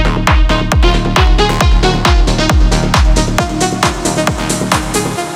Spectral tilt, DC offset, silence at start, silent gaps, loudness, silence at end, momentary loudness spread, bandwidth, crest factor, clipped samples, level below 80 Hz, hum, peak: -4.5 dB/octave; under 0.1%; 0 s; none; -12 LUFS; 0 s; 4 LU; 15 kHz; 10 dB; under 0.1%; -14 dBFS; none; 0 dBFS